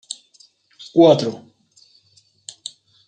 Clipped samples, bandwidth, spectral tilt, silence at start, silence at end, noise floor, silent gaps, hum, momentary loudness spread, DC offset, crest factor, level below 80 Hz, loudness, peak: under 0.1%; 9.2 kHz; -6 dB/octave; 0.95 s; 1.7 s; -58 dBFS; none; none; 26 LU; under 0.1%; 20 dB; -70 dBFS; -16 LUFS; -2 dBFS